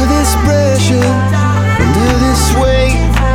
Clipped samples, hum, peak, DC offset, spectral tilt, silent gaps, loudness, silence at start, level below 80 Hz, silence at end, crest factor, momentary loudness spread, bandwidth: under 0.1%; none; 0 dBFS; under 0.1%; -5.5 dB/octave; none; -11 LUFS; 0 s; -16 dBFS; 0 s; 10 dB; 1 LU; 17 kHz